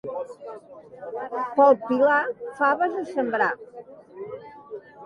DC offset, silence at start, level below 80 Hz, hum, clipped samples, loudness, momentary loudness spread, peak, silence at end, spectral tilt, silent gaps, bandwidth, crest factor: under 0.1%; 0.05 s; -72 dBFS; none; under 0.1%; -23 LUFS; 23 LU; -6 dBFS; 0 s; -6.5 dB/octave; none; 9.4 kHz; 18 dB